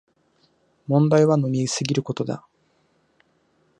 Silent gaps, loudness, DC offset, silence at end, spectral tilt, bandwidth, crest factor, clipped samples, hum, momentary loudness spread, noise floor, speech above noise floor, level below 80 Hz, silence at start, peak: none; -21 LUFS; under 0.1%; 1.4 s; -6 dB/octave; 10.5 kHz; 18 dB; under 0.1%; none; 14 LU; -65 dBFS; 45 dB; -68 dBFS; 0.9 s; -4 dBFS